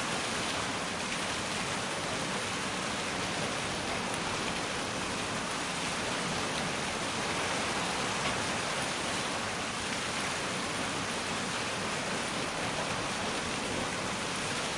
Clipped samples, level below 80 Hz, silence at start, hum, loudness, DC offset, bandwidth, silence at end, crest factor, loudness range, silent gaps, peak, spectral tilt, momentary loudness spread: under 0.1%; -56 dBFS; 0 s; none; -32 LUFS; under 0.1%; 11.5 kHz; 0 s; 16 dB; 1 LU; none; -16 dBFS; -2.5 dB/octave; 2 LU